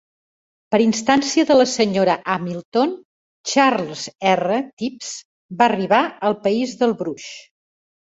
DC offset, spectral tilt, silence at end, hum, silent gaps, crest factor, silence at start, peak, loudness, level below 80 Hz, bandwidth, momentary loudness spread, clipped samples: under 0.1%; -4 dB/octave; 0.8 s; none; 2.65-2.72 s, 3.05-3.44 s, 4.73-4.77 s, 5.25-5.49 s; 20 dB; 0.7 s; 0 dBFS; -19 LUFS; -62 dBFS; 8 kHz; 16 LU; under 0.1%